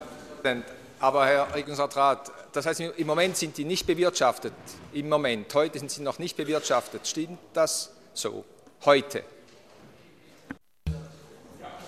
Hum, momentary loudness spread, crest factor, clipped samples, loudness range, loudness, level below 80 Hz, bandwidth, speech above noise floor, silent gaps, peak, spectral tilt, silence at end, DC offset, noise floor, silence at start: none; 16 LU; 24 dB; under 0.1%; 4 LU; -27 LUFS; -54 dBFS; 15 kHz; 28 dB; none; -6 dBFS; -3.5 dB/octave; 0 s; under 0.1%; -55 dBFS; 0 s